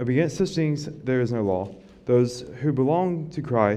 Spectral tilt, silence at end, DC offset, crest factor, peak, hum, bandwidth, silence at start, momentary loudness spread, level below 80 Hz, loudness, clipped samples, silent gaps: -7.5 dB/octave; 0 s; under 0.1%; 18 dB; -6 dBFS; none; 12 kHz; 0 s; 7 LU; -56 dBFS; -24 LUFS; under 0.1%; none